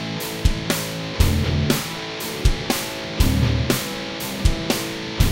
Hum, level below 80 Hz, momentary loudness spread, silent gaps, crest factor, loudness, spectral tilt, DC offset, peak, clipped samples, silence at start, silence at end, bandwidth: none; -26 dBFS; 7 LU; none; 18 dB; -22 LUFS; -4.5 dB/octave; under 0.1%; -2 dBFS; under 0.1%; 0 s; 0 s; 17 kHz